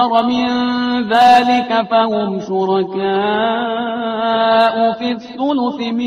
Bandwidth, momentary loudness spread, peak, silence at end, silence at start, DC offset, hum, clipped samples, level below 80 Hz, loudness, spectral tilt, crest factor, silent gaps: 10.5 kHz; 8 LU; 0 dBFS; 0 s; 0 s; under 0.1%; none; under 0.1%; -56 dBFS; -15 LUFS; -5.5 dB/octave; 14 dB; none